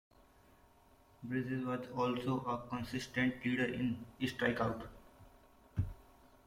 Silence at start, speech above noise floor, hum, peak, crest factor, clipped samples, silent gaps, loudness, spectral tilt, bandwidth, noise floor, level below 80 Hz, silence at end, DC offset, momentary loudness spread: 1.2 s; 28 dB; none; -20 dBFS; 20 dB; under 0.1%; none; -38 LUFS; -6.5 dB/octave; 16 kHz; -65 dBFS; -60 dBFS; 0.45 s; under 0.1%; 9 LU